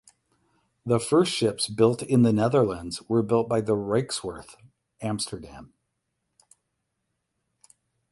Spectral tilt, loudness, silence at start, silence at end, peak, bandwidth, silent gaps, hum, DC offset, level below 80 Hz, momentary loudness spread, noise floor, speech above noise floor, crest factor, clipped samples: -5.5 dB/octave; -24 LUFS; 0.85 s; 2.45 s; -6 dBFS; 11.5 kHz; none; none; under 0.1%; -58 dBFS; 15 LU; -79 dBFS; 55 dB; 20 dB; under 0.1%